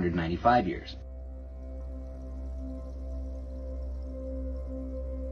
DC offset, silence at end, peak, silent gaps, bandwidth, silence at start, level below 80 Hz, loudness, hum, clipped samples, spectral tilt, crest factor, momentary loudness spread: under 0.1%; 0 s; -10 dBFS; none; 6.4 kHz; 0 s; -38 dBFS; -34 LUFS; none; under 0.1%; -8 dB/octave; 24 dB; 17 LU